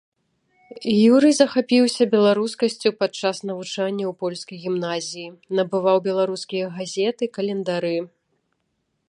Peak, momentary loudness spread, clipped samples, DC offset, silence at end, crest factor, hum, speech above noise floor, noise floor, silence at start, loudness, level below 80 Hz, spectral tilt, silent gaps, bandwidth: -2 dBFS; 13 LU; under 0.1%; under 0.1%; 1 s; 20 dB; none; 52 dB; -73 dBFS; 0.75 s; -21 LUFS; -72 dBFS; -5 dB/octave; none; 11.5 kHz